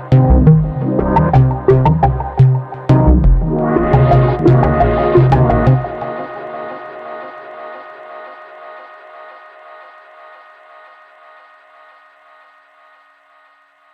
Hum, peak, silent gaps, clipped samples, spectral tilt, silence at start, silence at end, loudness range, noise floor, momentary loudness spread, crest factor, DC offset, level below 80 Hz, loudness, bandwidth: none; 0 dBFS; none; under 0.1%; -10.5 dB/octave; 0 s; 4.6 s; 21 LU; -51 dBFS; 22 LU; 14 dB; under 0.1%; -22 dBFS; -12 LUFS; 4.8 kHz